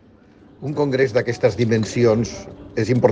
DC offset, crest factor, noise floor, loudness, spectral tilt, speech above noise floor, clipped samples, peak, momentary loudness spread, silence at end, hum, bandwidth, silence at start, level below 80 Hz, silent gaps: under 0.1%; 18 dB; -49 dBFS; -20 LUFS; -6.5 dB/octave; 30 dB; under 0.1%; -2 dBFS; 11 LU; 0 s; none; 9.4 kHz; 0.6 s; -50 dBFS; none